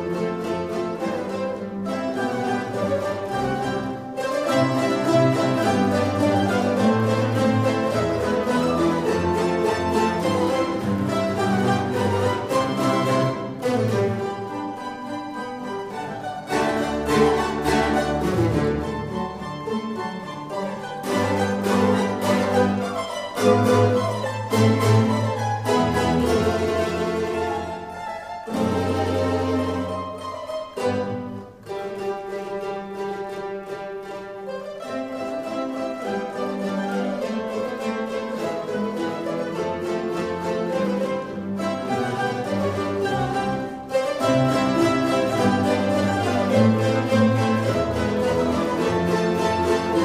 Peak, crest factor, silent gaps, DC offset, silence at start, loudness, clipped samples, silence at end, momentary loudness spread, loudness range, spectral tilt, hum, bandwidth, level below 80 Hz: -4 dBFS; 18 dB; none; under 0.1%; 0 s; -23 LUFS; under 0.1%; 0 s; 11 LU; 8 LU; -6 dB/octave; none; 15.5 kHz; -48 dBFS